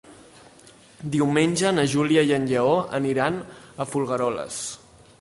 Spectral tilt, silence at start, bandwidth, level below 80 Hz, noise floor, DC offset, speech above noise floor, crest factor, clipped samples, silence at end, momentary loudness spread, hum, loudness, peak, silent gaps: -5 dB/octave; 0.1 s; 11.5 kHz; -58 dBFS; -51 dBFS; under 0.1%; 28 dB; 16 dB; under 0.1%; 0.45 s; 13 LU; none; -23 LUFS; -6 dBFS; none